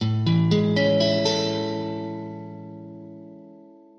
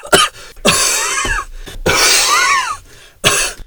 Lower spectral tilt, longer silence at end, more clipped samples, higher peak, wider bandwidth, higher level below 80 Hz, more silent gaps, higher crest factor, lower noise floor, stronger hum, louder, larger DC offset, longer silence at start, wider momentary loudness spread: first, -6 dB/octave vs -1 dB/octave; first, 0.4 s vs 0.05 s; second, under 0.1% vs 0.2%; second, -8 dBFS vs 0 dBFS; second, 7.4 kHz vs over 20 kHz; second, -58 dBFS vs -32 dBFS; neither; about the same, 16 dB vs 14 dB; first, -48 dBFS vs -37 dBFS; neither; second, -22 LUFS vs -12 LUFS; neither; about the same, 0 s vs 0.05 s; first, 21 LU vs 12 LU